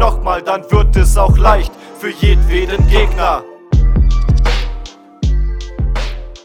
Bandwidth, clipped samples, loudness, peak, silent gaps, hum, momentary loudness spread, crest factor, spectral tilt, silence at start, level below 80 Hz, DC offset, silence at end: 13 kHz; 0.1%; -14 LUFS; 0 dBFS; none; none; 13 LU; 12 dB; -6 dB/octave; 0 s; -14 dBFS; under 0.1%; 0.1 s